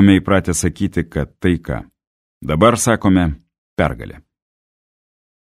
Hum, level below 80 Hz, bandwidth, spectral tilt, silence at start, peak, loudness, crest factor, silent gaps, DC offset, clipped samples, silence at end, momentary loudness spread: none; -36 dBFS; 15 kHz; -5.5 dB/octave; 0 s; 0 dBFS; -17 LUFS; 18 dB; 2.07-2.41 s, 3.58-3.76 s; under 0.1%; under 0.1%; 1.25 s; 17 LU